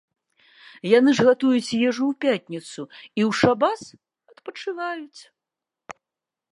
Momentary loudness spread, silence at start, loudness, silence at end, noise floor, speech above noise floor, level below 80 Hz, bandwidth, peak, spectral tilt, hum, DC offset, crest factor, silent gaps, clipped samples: 23 LU; 0.85 s; -21 LUFS; 0.6 s; -88 dBFS; 66 dB; -64 dBFS; 11.5 kHz; -4 dBFS; -5.5 dB/octave; none; under 0.1%; 20 dB; none; under 0.1%